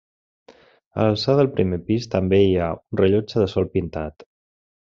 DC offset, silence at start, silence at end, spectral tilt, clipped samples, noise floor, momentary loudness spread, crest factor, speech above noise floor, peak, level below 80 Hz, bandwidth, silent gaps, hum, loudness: under 0.1%; 0.5 s; 0.7 s; -6.5 dB/octave; under 0.1%; -52 dBFS; 11 LU; 18 dB; 32 dB; -4 dBFS; -50 dBFS; 7.4 kHz; 0.86-0.91 s; none; -21 LUFS